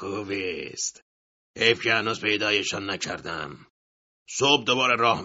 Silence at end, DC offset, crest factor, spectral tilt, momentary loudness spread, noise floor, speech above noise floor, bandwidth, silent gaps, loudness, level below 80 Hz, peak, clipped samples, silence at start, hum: 0 s; under 0.1%; 24 dB; -1 dB/octave; 12 LU; under -90 dBFS; over 65 dB; 8 kHz; 1.02-1.54 s, 3.70-4.26 s; -24 LUFS; -64 dBFS; -4 dBFS; under 0.1%; 0 s; none